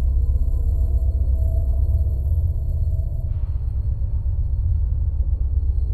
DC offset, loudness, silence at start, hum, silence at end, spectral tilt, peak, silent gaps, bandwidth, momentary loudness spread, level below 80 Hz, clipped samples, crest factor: under 0.1%; -23 LUFS; 0 s; none; 0 s; -11 dB/octave; -10 dBFS; none; 1.1 kHz; 4 LU; -20 dBFS; under 0.1%; 10 dB